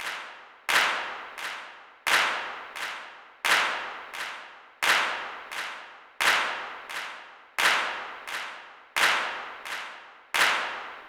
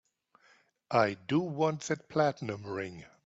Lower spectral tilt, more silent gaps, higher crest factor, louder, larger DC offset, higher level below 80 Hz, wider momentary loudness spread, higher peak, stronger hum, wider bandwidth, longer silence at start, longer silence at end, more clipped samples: second, 1 dB/octave vs -6 dB/octave; neither; about the same, 20 dB vs 20 dB; first, -27 LUFS vs -32 LUFS; neither; about the same, -70 dBFS vs -72 dBFS; first, 17 LU vs 10 LU; about the same, -10 dBFS vs -12 dBFS; neither; first, over 20 kHz vs 8 kHz; second, 0 s vs 0.9 s; second, 0 s vs 0.2 s; neither